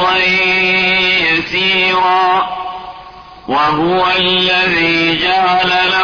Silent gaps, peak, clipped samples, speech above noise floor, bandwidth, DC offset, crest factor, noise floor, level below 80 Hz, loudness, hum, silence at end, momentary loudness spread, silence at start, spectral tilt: none; -4 dBFS; under 0.1%; 22 dB; 5.4 kHz; under 0.1%; 10 dB; -34 dBFS; -44 dBFS; -11 LUFS; none; 0 s; 9 LU; 0 s; -4.5 dB/octave